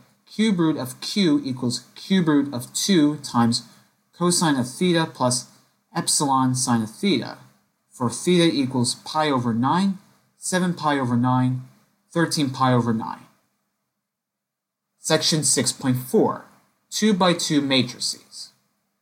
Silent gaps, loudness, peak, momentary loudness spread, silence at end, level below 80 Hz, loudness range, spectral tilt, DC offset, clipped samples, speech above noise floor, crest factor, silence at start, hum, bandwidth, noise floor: none; -22 LUFS; -4 dBFS; 11 LU; 0.55 s; -66 dBFS; 3 LU; -4.5 dB/octave; under 0.1%; under 0.1%; 62 dB; 18 dB; 0.3 s; none; 17 kHz; -83 dBFS